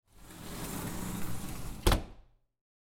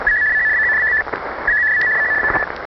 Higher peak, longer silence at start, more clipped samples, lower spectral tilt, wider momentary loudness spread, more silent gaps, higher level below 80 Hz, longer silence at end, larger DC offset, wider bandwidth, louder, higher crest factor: second, -10 dBFS vs -6 dBFS; first, 0.15 s vs 0 s; neither; first, -4.5 dB/octave vs -1.5 dB/octave; first, 17 LU vs 6 LU; neither; about the same, -40 dBFS vs -42 dBFS; first, 0.65 s vs 0.1 s; neither; first, 17 kHz vs 6 kHz; second, -36 LUFS vs -15 LUFS; first, 26 dB vs 12 dB